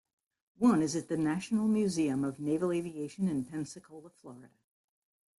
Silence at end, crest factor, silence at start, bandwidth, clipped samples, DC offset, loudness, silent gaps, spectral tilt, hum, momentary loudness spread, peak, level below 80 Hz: 0.95 s; 18 dB; 0.6 s; 12 kHz; under 0.1%; under 0.1%; -32 LUFS; none; -6 dB/octave; none; 22 LU; -16 dBFS; -70 dBFS